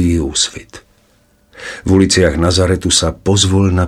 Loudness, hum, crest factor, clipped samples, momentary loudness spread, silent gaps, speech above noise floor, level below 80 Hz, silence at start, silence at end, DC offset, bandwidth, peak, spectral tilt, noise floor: -13 LUFS; none; 14 dB; under 0.1%; 14 LU; none; 41 dB; -30 dBFS; 0 s; 0 s; under 0.1%; 13 kHz; 0 dBFS; -4.5 dB/octave; -53 dBFS